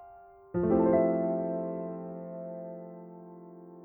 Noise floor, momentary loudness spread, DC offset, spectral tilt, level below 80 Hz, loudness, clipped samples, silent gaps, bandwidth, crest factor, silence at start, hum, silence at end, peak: -53 dBFS; 23 LU; under 0.1%; -13.5 dB/octave; -60 dBFS; -30 LUFS; under 0.1%; none; 2.8 kHz; 18 dB; 0 s; none; 0 s; -12 dBFS